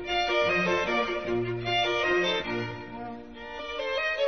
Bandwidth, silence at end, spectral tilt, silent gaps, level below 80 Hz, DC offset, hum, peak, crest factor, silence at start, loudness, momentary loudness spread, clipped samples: 6.6 kHz; 0 s; -4.5 dB/octave; none; -54 dBFS; 0.2%; none; -14 dBFS; 14 dB; 0 s; -27 LUFS; 15 LU; under 0.1%